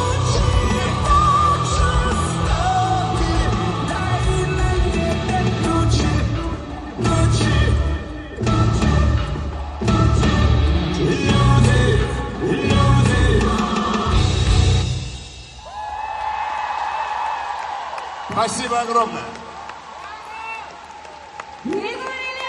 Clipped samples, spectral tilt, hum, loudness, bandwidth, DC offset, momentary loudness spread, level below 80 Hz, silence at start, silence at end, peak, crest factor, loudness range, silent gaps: under 0.1%; -5.5 dB/octave; none; -19 LUFS; 11 kHz; under 0.1%; 16 LU; -24 dBFS; 0 s; 0 s; -2 dBFS; 16 dB; 7 LU; none